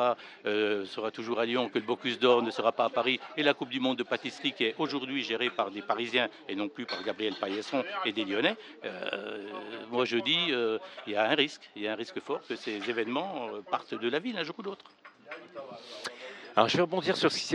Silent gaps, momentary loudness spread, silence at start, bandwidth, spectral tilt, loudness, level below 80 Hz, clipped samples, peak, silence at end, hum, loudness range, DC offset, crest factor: none; 14 LU; 0 s; 11 kHz; -4 dB/octave; -31 LUFS; -82 dBFS; under 0.1%; -6 dBFS; 0 s; none; 6 LU; under 0.1%; 24 dB